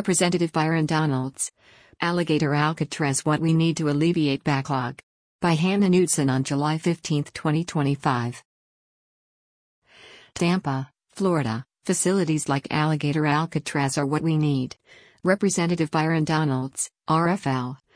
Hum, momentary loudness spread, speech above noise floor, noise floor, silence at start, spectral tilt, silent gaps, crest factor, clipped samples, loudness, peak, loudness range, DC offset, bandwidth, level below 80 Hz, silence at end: none; 7 LU; 27 dB; -50 dBFS; 0 s; -5.5 dB/octave; 5.03-5.39 s, 8.45-9.82 s; 16 dB; under 0.1%; -24 LUFS; -8 dBFS; 6 LU; under 0.1%; 10.5 kHz; -60 dBFS; 0.2 s